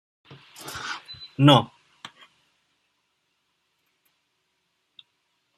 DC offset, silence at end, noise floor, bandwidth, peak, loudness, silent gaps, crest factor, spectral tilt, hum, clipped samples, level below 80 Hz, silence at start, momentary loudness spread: under 0.1%; 3.95 s; -74 dBFS; 14.5 kHz; -2 dBFS; -21 LUFS; none; 26 dB; -6 dB/octave; none; under 0.1%; -68 dBFS; 0.65 s; 28 LU